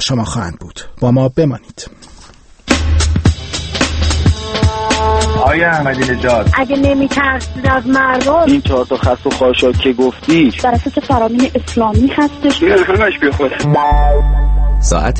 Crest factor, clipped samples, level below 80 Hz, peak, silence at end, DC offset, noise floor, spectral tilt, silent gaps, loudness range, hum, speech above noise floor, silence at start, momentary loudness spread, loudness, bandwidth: 12 dB; under 0.1%; -20 dBFS; 0 dBFS; 0 s; under 0.1%; -39 dBFS; -5.5 dB/octave; none; 4 LU; none; 27 dB; 0 s; 6 LU; -13 LUFS; 8.8 kHz